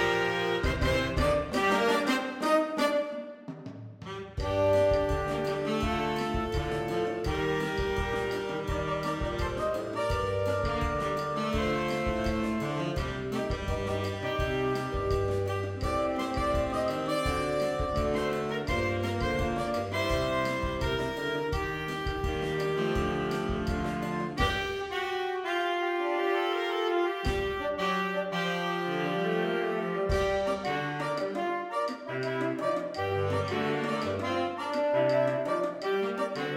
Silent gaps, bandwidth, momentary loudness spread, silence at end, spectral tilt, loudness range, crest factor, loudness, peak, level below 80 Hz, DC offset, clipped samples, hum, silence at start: none; 17 kHz; 5 LU; 0 s; -5.5 dB/octave; 2 LU; 16 dB; -30 LUFS; -12 dBFS; -42 dBFS; under 0.1%; under 0.1%; none; 0 s